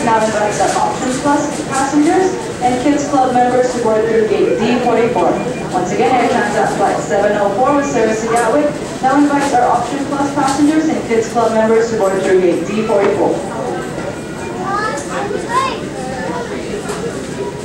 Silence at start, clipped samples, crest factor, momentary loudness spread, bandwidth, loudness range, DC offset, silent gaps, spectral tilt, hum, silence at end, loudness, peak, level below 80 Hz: 0 s; under 0.1%; 12 dB; 9 LU; 15.5 kHz; 5 LU; under 0.1%; none; -5 dB/octave; none; 0 s; -15 LUFS; -2 dBFS; -42 dBFS